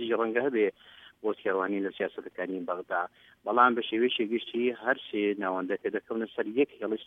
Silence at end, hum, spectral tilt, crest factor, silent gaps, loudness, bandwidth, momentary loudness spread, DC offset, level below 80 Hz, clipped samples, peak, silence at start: 0 s; none; -7 dB/octave; 22 dB; none; -30 LUFS; 3.9 kHz; 11 LU; under 0.1%; -78 dBFS; under 0.1%; -8 dBFS; 0 s